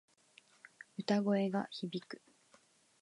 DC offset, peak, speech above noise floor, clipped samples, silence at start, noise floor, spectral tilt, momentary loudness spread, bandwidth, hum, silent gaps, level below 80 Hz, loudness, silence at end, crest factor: under 0.1%; -20 dBFS; 33 dB; under 0.1%; 1 s; -69 dBFS; -6.5 dB/octave; 20 LU; 11 kHz; none; none; -88 dBFS; -36 LUFS; 0.85 s; 20 dB